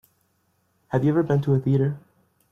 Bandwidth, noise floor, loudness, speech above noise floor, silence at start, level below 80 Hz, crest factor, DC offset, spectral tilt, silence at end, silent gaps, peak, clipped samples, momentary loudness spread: 6.4 kHz; -68 dBFS; -23 LUFS; 47 dB; 0.9 s; -60 dBFS; 16 dB; under 0.1%; -10 dB/octave; 0.55 s; none; -8 dBFS; under 0.1%; 7 LU